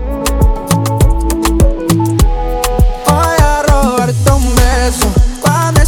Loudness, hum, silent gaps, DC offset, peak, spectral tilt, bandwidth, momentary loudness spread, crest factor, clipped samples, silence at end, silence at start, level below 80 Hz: -12 LUFS; none; none; under 0.1%; 0 dBFS; -5.5 dB/octave; 19.5 kHz; 3 LU; 10 dB; under 0.1%; 0 s; 0 s; -14 dBFS